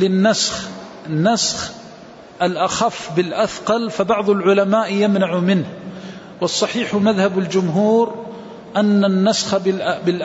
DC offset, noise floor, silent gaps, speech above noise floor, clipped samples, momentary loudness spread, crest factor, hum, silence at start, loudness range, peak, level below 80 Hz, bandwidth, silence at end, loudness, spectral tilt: under 0.1%; -39 dBFS; none; 22 dB; under 0.1%; 15 LU; 14 dB; none; 0 s; 2 LU; -4 dBFS; -56 dBFS; 8 kHz; 0 s; -18 LUFS; -5 dB/octave